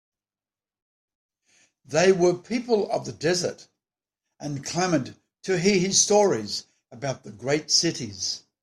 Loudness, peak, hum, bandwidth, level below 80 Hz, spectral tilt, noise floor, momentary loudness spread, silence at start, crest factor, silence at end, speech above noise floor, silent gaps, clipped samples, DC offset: -24 LUFS; -6 dBFS; none; 13 kHz; -64 dBFS; -3.5 dB/octave; under -90 dBFS; 14 LU; 1.9 s; 20 dB; 0.25 s; over 66 dB; none; under 0.1%; under 0.1%